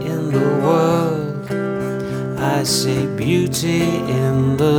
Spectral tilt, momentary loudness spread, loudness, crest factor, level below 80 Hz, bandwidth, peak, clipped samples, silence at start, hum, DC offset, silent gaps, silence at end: -5.5 dB/octave; 8 LU; -18 LUFS; 16 dB; -46 dBFS; 19.5 kHz; -2 dBFS; under 0.1%; 0 s; none; under 0.1%; none; 0 s